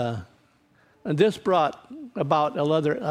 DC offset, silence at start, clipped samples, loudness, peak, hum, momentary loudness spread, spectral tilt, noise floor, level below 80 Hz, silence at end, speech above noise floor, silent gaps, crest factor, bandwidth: under 0.1%; 0 s; under 0.1%; -24 LUFS; -6 dBFS; none; 15 LU; -7 dB/octave; -61 dBFS; -64 dBFS; 0 s; 37 dB; none; 18 dB; 13 kHz